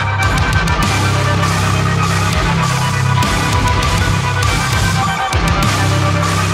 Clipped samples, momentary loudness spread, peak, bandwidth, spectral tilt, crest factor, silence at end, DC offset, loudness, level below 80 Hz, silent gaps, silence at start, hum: under 0.1%; 1 LU; -2 dBFS; 16 kHz; -4.5 dB/octave; 12 dB; 0 s; under 0.1%; -14 LUFS; -24 dBFS; none; 0 s; none